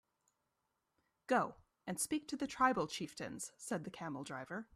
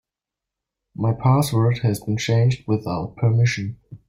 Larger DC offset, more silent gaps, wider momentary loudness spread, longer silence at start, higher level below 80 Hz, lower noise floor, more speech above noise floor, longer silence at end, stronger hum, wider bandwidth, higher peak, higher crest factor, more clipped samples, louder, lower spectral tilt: neither; neither; about the same, 12 LU vs 10 LU; first, 1.3 s vs 1 s; second, -74 dBFS vs -52 dBFS; about the same, -86 dBFS vs -87 dBFS; second, 46 dB vs 67 dB; about the same, 0.1 s vs 0.1 s; neither; about the same, 14.5 kHz vs 15.5 kHz; second, -18 dBFS vs -8 dBFS; first, 24 dB vs 14 dB; neither; second, -40 LUFS vs -21 LUFS; second, -3.5 dB/octave vs -6.5 dB/octave